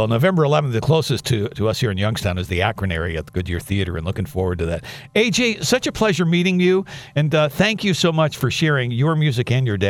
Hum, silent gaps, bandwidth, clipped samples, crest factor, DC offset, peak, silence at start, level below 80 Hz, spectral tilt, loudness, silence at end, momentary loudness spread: none; none; 16 kHz; under 0.1%; 18 dB; under 0.1%; -2 dBFS; 0 s; -42 dBFS; -5.5 dB/octave; -19 LUFS; 0 s; 8 LU